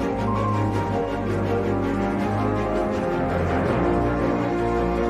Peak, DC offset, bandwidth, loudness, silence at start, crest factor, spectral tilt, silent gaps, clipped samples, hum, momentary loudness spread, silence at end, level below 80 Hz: -10 dBFS; under 0.1%; 13 kHz; -23 LUFS; 0 s; 12 dB; -8 dB/octave; none; under 0.1%; none; 2 LU; 0 s; -36 dBFS